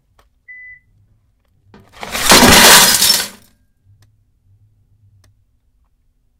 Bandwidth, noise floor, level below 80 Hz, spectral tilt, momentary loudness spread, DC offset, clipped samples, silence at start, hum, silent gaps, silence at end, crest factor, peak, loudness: over 20 kHz; -59 dBFS; -36 dBFS; -1 dB/octave; 21 LU; under 0.1%; 0.5%; 2 s; none; none; 3.1 s; 16 dB; 0 dBFS; -6 LUFS